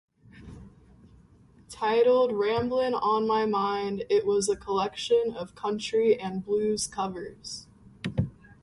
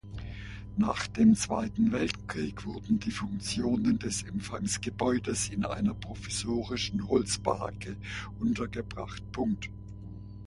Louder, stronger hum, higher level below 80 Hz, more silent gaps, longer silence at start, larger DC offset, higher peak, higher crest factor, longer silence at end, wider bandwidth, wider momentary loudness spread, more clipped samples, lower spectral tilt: first, -27 LUFS vs -31 LUFS; second, none vs 60 Hz at -45 dBFS; second, -56 dBFS vs -48 dBFS; neither; first, 0.35 s vs 0.05 s; neither; about the same, -12 dBFS vs -12 dBFS; about the same, 16 dB vs 20 dB; about the same, 0.1 s vs 0 s; about the same, 11.5 kHz vs 11.5 kHz; first, 15 LU vs 12 LU; neither; about the same, -4.5 dB/octave vs -5 dB/octave